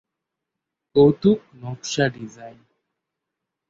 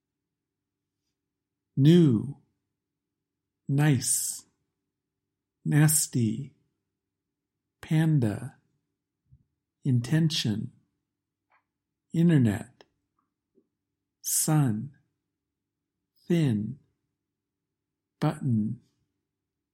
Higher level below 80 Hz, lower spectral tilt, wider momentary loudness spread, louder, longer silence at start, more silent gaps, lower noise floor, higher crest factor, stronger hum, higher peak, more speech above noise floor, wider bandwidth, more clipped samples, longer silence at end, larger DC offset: first, -56 dBFS vs -68 dBFS; about the same, -6 dB/octave vs -5.5 dB/octave; first, 20 LU vs 17 LU; first, -20 LUFS vs -26 LUFS; second, 0.95 s vs 1.75 s; neither; about the same, -83 dBFS vs -86 dBFS; about the same, 20 dB vs 22 dB; neither; first, -4 dBFS vs -8 dBFS; about the same, 63 dB vs 62 dB; second, 7.8 kHz vs 16 kHz; neither; first, 1.2 s vs 0.95 s; neither